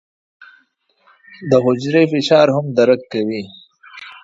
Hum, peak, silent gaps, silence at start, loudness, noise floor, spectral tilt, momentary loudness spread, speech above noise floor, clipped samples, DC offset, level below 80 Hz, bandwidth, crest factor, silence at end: none; 0 dBFS; none; 1.4 s; -15 LUFS; -60 dBFS; -6.5 dB/octave; 21 LU; 45 dB; under 0.1%; under 0.1%; -62 dBFS; 7.8 kHz; 18 dB; 0.1 s